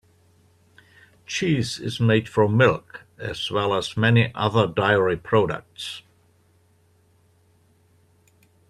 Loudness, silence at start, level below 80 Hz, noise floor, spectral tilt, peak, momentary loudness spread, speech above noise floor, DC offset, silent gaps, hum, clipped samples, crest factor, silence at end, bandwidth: -22 LUFS; 1.3 s; -56 dBFS; -60 dBFS; -6 dB/octave; -2 dBFS; 15 LU; 39 dB; under 0.1%; none; none; under 0.1%; 22 dB; 2.7 s; 12.5 kHz